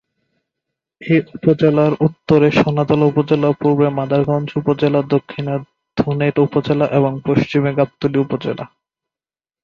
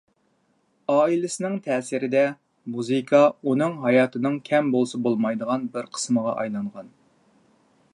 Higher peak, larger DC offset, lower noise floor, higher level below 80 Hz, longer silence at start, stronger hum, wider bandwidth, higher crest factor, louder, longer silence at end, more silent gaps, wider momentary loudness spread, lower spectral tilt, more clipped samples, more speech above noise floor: first, 0 dBFS vs -4 dBFS; neither; first, under -90 dBFS vs -67 dBFS; first, -52 dBFS vs -76 dBFS; about the same, 1 s vs 0.9 s; neither; second, 7 kHz vs 11.5 kHz; about the same, 16 dB vs 18 dB; first, -16 LUFS vs -23 LUFS; about the same, 0.95 s vs 1.05 s; neither; about the same, 9 LU vs 11 LU; first, -9 dB/octave vs -5.5 dB/octave; neither; first, over 75 dB vs 45 dB